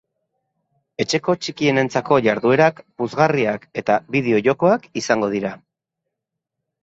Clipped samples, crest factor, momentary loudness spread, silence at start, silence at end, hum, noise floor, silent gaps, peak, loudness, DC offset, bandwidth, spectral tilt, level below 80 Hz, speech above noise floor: under 0.1%; 20 dB; 9 LU; 1 s; 1.25 s; none; -82 dBFS; none; -2 dBFS; -19 LUFS; under 0.1%; 8 kHz; -5.5 dB/octave; -60 dBFS; 63 dB